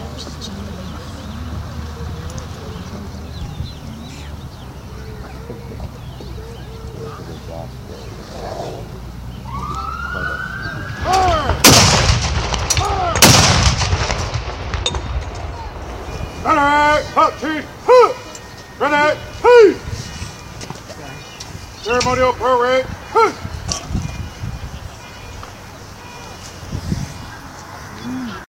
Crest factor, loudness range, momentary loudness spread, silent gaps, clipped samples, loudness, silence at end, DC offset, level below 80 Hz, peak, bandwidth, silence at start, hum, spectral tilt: 18 dB; 18 LU; 22 LU; none; under 0.1%; -15 LUFS; 0.05 s; under 0.1%; -30 dBFS; 0 dBFS; 16 kHz; 0 s; none; -3.5 dB/octave